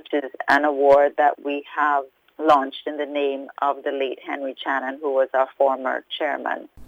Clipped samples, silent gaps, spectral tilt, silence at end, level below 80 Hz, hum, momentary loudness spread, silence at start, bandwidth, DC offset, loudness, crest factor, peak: under 0.1%; none; -4.5 dB/octave; 0 s; -64 dBFS; none; 12 LU; 0.1 s; 8.2 kHz; under 0.1%; -22 LUFS; 16 dB; -6 dBFS